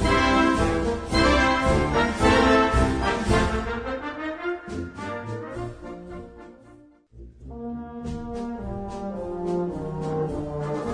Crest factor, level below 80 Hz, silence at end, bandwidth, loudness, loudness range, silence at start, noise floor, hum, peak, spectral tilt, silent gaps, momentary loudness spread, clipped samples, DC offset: 18 dB; -34 dBFS; 0 s; 10.5 kHz; -24 LUFS; 16 LU; 0 s; -51 dBFS; none; -6 dBFS; -5.5 dB/octave; none; 16 LU; under 0.1%; under 0.1%